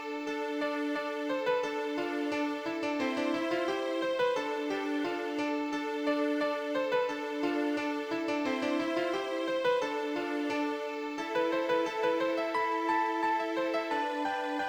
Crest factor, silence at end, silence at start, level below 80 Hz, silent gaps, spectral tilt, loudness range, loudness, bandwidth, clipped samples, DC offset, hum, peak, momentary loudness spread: 16 dB; 0 s; 0 s; -76 dBFS; none; -4 dB/octave; 1 LU; -32 LUFS; over 20 kHz; under 0.1%; under 0.1%; none; -16 dBFS; 4 LU